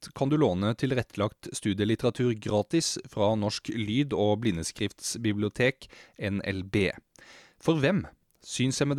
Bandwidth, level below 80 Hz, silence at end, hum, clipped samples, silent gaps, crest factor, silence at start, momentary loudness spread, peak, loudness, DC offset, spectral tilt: 14 kHz; -58 dBFS; 0 s; none; under 0.1%; none; 16 dB; 0 s; 7 LU; -12 dBFS; -28 LUFS; under 0.1%; -5 dB/octave